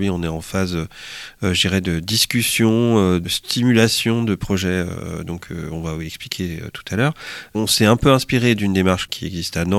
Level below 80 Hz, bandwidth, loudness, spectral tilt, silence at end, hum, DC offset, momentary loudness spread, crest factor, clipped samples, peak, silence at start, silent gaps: -40 dBFS; 16.5 kHz; -19 LUFS; -4.5 dB/octave; 0 s; none; under 0.1%; 14 LU; 18 dB; under 0.1%; -2 dBFS; 0 s; none